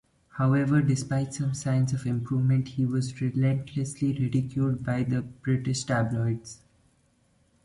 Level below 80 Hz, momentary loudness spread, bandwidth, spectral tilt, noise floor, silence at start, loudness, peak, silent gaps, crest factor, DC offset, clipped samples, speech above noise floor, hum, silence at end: -56 dBFS; 6 LU; 11.5 kHz; -7 dB/octave; -66 dBFS; 0.35 s; -27 LUFS; -12 dBFS; none; 16 dB; under 0.1%; under 0.1%; 40 dB; none; 1.1 s